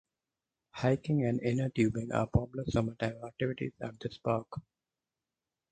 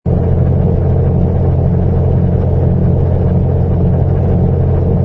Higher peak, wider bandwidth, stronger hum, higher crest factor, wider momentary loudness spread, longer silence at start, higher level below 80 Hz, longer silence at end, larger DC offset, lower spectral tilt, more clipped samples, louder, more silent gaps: second, -14 dBFS vs 0 dBFS; first, 9.2 kHz vs 3 kHz; neither; first, 20 dB vs 10 dB; first, 10 LU vs 1 LU; first, 0.75 s vs 0.05 s; second, -52 dBFS vs -20 dBFS; first, 1.1 s vs 0 s; neither; second, -7.5 dB/octave vs -12.5 dB/octave; neither; second, -33 LUFS vs -13 LUFS; neither